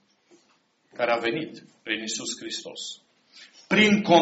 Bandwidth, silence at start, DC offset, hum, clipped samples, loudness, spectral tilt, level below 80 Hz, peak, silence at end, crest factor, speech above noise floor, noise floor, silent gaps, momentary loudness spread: 8 kHz; 1 s; under 0.1%; none; under 0.1%; -25 LUFS; -3 dB/octave; -66 dBFS; -4 dBFS; 0 s; 24 dB; 42 dB; -66 dBFS; none; 20 LU